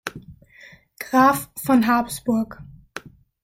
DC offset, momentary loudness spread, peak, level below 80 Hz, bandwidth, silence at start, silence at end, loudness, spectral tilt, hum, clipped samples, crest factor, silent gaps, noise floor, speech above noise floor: under 0.1%; 22 LU; -4 dBFS; -54 dBFS; 16.5 kHz; 0.05 s; 0.45 s; -20 LUFS; -5 dB/octave; none; under 0.1%; 18 dB; none; -49 dBFS; 29 dB